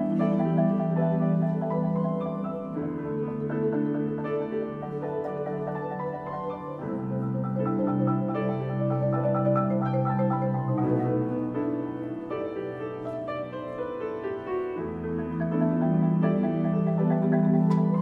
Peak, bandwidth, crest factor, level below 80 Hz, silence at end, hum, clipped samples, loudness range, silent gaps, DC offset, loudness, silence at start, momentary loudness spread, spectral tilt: -12 dBFS; 4.3 kHz; 14 dB; -60 dBFS; 0 s; none; under 0.1%; 6 LU; none; under 0.1%; -28 LUFS; 0 s; 9 LU; -11 dB/octave